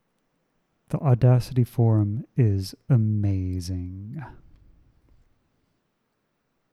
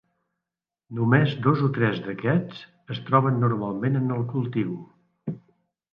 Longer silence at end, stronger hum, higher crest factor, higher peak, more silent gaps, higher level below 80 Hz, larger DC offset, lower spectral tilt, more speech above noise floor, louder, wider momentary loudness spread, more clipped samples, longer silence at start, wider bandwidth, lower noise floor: first, 2.4 s vs 0.55 s; neither; about the same, 18 dB vs 20 dB; about the same, -8 dBFS vs -6 dBFS; neither; first, -52 dBFS vs -64 dBFS; neither; second, -8.5 dB/octave vs -10 dB/octave; second, 52 dB vs 65 dB; about the same, -23 LUFS vs -24 LUFS; about the same, 16 LU vs 17 LU; neither; about the same, 0.9 s vs 0.9 s; first, 12.5 kHz vs 5.4 kHz; second, -74 dBFS vs -88 dBFS